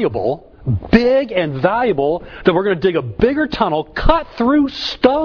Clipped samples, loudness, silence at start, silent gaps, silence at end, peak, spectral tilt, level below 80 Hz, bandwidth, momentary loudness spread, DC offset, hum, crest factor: under 0.1%; -17 LUFS; 0 s; none; 0 s; 0 dBFS; -7.5 dB/octave; -30 dBFS; 5.4 kHz; 6 LU; under 0.1%; none; 16 dB